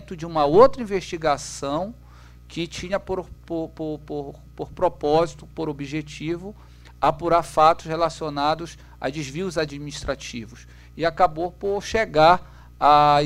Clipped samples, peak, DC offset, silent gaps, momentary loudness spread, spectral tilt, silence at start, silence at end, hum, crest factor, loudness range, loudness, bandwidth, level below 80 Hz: under 0.1%; -2 dBFS; under 0.1%; none; 16 LU; -5 dB/octave; 0 s; 0 s; none; 22 dB; 6 LU; -23 LUFS; 15 kHz; -44 dBFS